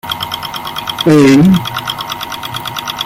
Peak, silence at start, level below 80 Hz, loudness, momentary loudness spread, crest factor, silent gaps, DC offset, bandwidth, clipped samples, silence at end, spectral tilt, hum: 0 dBFS; 0.05 s; -44 dBFS; -13 LUFS; 14 LU; 12 dB; none; under 0.1%; 16.5 kHz; under 0.1%; 0 s; -5.5 dB/octave; none